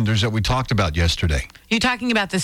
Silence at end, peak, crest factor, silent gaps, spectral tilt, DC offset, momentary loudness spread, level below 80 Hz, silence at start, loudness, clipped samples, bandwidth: 0 s; -6 dBFS; 14 dB; none; -5 dB/octave; under 0.1%; 4 LU; -30 dBFS; 0 s; -20 LUFS; under 0.1%; 15.5 kHz